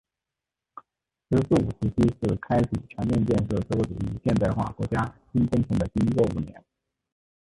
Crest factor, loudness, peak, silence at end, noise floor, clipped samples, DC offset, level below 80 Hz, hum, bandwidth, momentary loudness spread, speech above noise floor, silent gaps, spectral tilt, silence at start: 18 dB; -26 LUFS; -8 dBFS; 0.95 s; -88 dBFS; under 0.1%; under 0.1%; -42 dBFS; none; 11.5 kHz; 6 LU; 63 dB; none; -8.5 dB/octave; 0.75 s